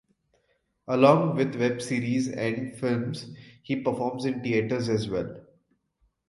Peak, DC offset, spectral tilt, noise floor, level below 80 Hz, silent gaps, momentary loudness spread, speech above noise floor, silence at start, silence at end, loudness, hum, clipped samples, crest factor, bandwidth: -4 dBFS; under 0.1%; -6.5 dB/octave; -72 dBFS; -62 dBFS; none; 15 LU; 46 dB; 0.9 s; 0.9 s; -26 LUFS; none; under 0.1%; 24 dB; 11.5 kHz